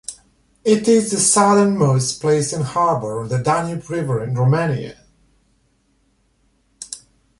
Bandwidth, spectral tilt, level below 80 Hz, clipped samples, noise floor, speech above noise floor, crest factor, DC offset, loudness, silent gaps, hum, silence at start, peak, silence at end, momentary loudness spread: 11.5 kHz; -5 dB/octave; -54 dBFS; under 0.1%; -62 dBFS; 45 dB; 18 dB; under 0.1%; -17 LUFS; none; none; 0.1 s; -2 dBFS; 0.4 s; 19 LU